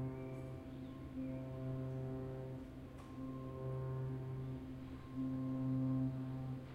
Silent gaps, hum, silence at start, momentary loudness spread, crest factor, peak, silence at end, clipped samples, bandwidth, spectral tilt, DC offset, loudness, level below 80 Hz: none; none; 0 s; 11 LU; 14 dB; -30 dBFS; 0 s; under 0.1%; 5.2 kHz; -9.5 dB/octave; under 0.1%; -45 LUFS; -62 dBFS